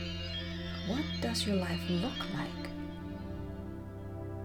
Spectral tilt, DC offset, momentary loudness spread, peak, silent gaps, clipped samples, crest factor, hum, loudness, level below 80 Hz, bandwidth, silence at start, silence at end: -5.5 dB/octave; under 0.1%; 11 LU; -22 dBFS; none; under 0.1%; 16 dB; none; -37 LUFS; -52 dBFS; 18 kHz; 0 s; 0 s